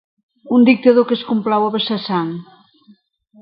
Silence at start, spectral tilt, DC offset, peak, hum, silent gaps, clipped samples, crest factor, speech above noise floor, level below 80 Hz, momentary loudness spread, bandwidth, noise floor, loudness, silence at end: 0.45 s; -9 dB/octave; under 0.1%; 0 dBFS; none; none; under 0.1%; 16 dB; 37 dB; -64 dBFS; 10 LU; 5.4 kHz; -52 dBFS; -16 LUFS; 1 s